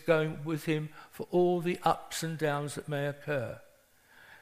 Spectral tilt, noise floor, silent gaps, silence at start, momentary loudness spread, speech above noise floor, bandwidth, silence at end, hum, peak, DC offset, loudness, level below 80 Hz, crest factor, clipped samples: -5.5 dB/octave; -62 dBFS; none; 0 s; 10 LU; 31 dB; 15.5 kHz; 0.05 s; none; -12 dBFS; under 0.1%; -32 LUFS; -66 dBFS; 20 dB; under 0.1%